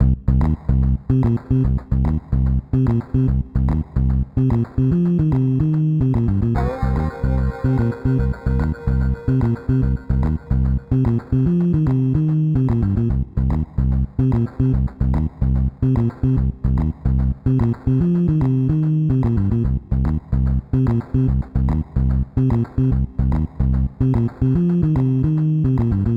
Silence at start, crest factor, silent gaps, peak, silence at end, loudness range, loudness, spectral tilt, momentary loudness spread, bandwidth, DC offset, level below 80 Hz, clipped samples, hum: 0 s; 14 dB; none; -2 dBFS; 0 s; 1 LU; -19 LUFS; -11.5 dB/octave; 3 LU; 4.4 kHz; 0.1%; -24 dBFS; under 0.1%; none